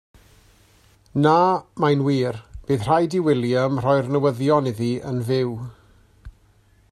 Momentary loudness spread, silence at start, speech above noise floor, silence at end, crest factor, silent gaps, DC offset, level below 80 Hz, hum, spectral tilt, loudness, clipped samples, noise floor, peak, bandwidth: 9 LU; 1.15 s; 37 dB; 0.6 s; 18 dB; none; under 0.1%; -50 dBFS; none; -7.5 dB/octave; -21 LUFS; under 0.1%; -57 dBFS; -4 dBFS; 13 kHz